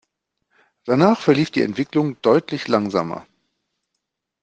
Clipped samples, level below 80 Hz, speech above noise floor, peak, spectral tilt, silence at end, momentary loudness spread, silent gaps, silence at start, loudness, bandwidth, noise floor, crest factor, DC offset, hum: under 0.1%; -64 dBFS; 60 dB; -2 dBFS; -7 dB/octave; 1.2 s; 10 LU; none; 0.85 s; -19 LUFS; 8.8 kHz; -79 dBFS; 20 dB; under 0.1%; none